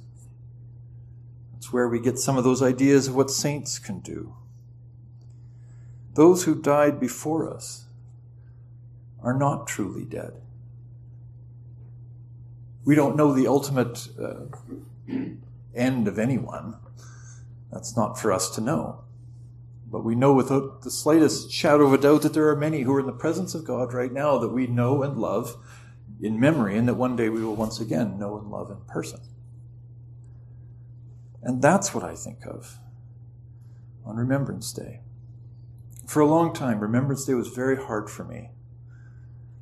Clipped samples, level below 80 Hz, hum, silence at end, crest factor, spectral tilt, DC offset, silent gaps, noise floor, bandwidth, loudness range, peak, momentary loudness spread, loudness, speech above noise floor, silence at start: under 0.1%; -56 dBFS; none; 0 s; 22 dB; -6 dB/octave; under 0.1%; none; -46 dBFS; 13 kHz; 10 LU; -4 dBFS; 26 LU; -24 LUFS; 23 dB; 0 s